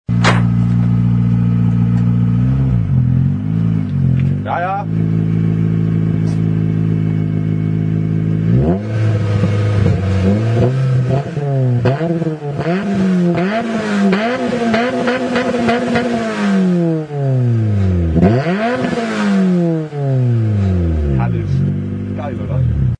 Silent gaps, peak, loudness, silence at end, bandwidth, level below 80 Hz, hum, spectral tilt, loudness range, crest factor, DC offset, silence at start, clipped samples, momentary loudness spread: none; 0 dBFS; -15 LUFS; 0.05 s; 9.6 kHz; -30 dBFS; none; -8 dB/octave; 1 LU; 14 dB; under 0.1%; 0.1 s; under 0.1%; 4 LU